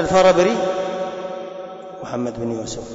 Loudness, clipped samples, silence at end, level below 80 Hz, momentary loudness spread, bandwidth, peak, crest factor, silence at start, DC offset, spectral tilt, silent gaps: -20 LUFS; under 0.1%; 0 s; -48 dBFS; 19 LU; 8 kHz; -6 dBFS; 16 dB; 0 s; under 0.1%; -5 dB/octave; none